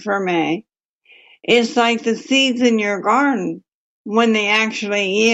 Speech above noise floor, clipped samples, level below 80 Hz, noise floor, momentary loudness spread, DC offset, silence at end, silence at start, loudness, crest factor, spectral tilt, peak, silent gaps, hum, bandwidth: 36 dB; under 0.1%; -70 dBFS; -53 dBFS; 11 LU; under 0.1%; 0 s; 0 s; -17 LUFS; 16 dB; -3.5 dB/octave; -2 dBFS; 0.85-0.99 s, 3.74-4.05 s; none; 8.2 kHz